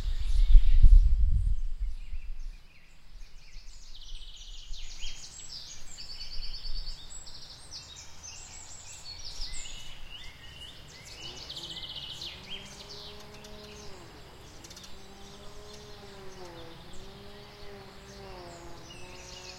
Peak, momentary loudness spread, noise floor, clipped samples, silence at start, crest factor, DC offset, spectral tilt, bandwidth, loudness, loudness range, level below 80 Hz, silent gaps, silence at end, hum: -4 dBFS; 18 LU; -49 dBFS; under 0.1%; 0 s; 26 dB; under 0.1%; -4 dB/octave; 8.8 kHz; -35 LUFS; 16 LU; -30 dBFS; none; 0 s; none